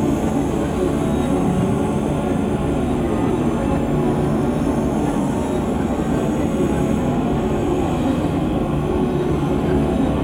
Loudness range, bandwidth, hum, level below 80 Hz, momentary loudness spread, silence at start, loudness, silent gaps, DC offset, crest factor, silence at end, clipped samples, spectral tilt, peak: 0 LU; 16.5 kHz; none; -32 dBFS; 2 LU; 0 s; -20 LUFS; none; under 0.1%; 14 dB; 0 s; under 0.1%; -7.5 dB/octave; -6 dBFS